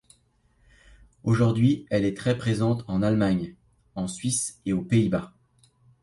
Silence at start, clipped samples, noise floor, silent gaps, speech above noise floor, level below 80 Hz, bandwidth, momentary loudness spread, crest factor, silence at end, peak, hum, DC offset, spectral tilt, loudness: 1.25 s; under 0.1%; -65 dBFS; none; 41 dB; -52 dBFS; 11.5 kHz; 11 LU; 18 dB; 0.75 s; -8 dBFS; none; under 0.1%; -6 dB/octave; -25 LUFS